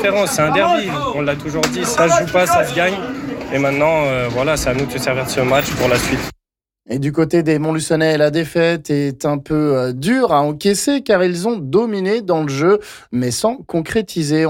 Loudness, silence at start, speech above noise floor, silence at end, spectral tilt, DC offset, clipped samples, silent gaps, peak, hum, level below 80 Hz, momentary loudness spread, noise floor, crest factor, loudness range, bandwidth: -17 LUFS; 0 s; 48 dB; 0 s; -5 dB/octave; under 0.1%; under 0.1%; none; -4 dBFS; none; -42 dBFS; 6 LU; -64 dBFS; 12 dB; 2 LU; 17 kHz